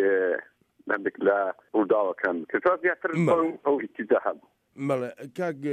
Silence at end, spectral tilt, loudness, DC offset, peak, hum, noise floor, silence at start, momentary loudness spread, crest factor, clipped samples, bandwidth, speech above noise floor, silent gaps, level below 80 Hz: 0 s; -8 dB/octave; -26 LUFS; under 0.1%; -10 dBFS; none; -46 dBFS; 0 s; 9 LU; 16 dB; under 0.1%; 10.5 kHz; 20 dB; none; -74 dBFS